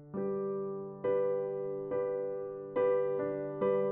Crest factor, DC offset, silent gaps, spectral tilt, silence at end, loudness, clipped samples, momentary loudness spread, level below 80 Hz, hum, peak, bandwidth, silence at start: 14 dB; under 0.1%; none; -8 dB/octave; 0 s; -34 LUFS; under 0.1%; 7 LU; -72 dBFS; none; -20 dBFS; 3.7 kHz; 0 s